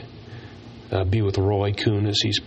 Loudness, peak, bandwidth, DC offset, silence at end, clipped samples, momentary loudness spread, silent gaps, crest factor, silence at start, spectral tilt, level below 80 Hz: -22 LUFS; -8 dBFS; 8.2 kHz; under 0.1%; 0 s; under 0.1%; 19 LU; none; 16 dB; 0 s; -5.5 dB/octave; -48 dBFS